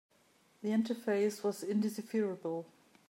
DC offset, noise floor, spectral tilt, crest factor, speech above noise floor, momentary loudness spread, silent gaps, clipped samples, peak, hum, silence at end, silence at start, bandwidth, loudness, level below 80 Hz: under 0.1%; -69 dBFS; -6 dB/octave; 14 dB; 35 dB; 9 LU; none; under 0.1%; -22 dBFS; none; 0.45 s; 0.6 s; 16 kHz; -35 LUFS; -90 dBFS